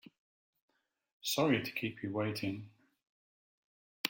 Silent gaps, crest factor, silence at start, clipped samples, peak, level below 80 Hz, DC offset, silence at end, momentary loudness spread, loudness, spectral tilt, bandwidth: 3.09-4.04 s; 26 dB; 1.25 s; under 0.1%; -14 dBFS; -76 dBFS; under 0.1%; 0 s; 10 LU; -35 LUFS; -4.5 dB/octave; 17 kHz